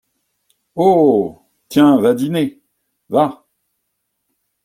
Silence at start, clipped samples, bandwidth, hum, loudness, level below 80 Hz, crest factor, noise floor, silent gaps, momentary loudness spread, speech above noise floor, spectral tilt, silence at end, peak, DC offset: 0.75 s; under 0.1%; 16 kHz; none; -15 LUFS; -58 dBFS; 16 dB; -72 dBFS; none; 11 LU; 59 dB; -7 dB/octave; 1.3 s; -2 dBFS; under 0.1%